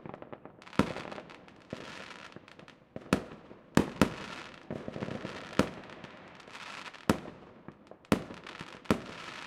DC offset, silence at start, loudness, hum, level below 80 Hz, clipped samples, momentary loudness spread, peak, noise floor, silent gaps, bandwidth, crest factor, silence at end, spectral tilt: under 0.1%; 0 s; -35 LUFS; none; -58 dBFS; under 0.1%; 20 LU; -4 dBFS; -55 dBFS; none; 16 kHz; 32 dB; 0 s; -5.5 dB/octave